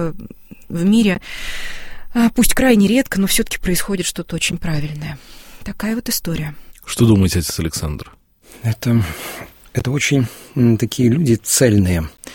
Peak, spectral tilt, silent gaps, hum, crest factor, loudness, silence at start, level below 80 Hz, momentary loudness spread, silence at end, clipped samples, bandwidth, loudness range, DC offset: 0 dBFS; -5 dB/octave; none; none; 16 dB; -17 LUFS; 0 s; -34 dBFS; 17 LU; 0 s; under 0.1%; 17 kHz; 5 LU; under 0.1%